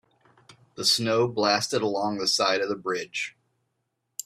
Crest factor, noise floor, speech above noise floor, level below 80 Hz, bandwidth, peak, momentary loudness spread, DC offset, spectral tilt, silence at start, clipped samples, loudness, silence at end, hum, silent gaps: 20 dB; -78 dBFS; 53 dB; -70 dBFS; 15.5 kHz; -8 dBFS; 10 LU; under 0.1%; -3 dB/octave; 0.5 s; under 0.1%; -25 LUFS; 0.05 s; none; none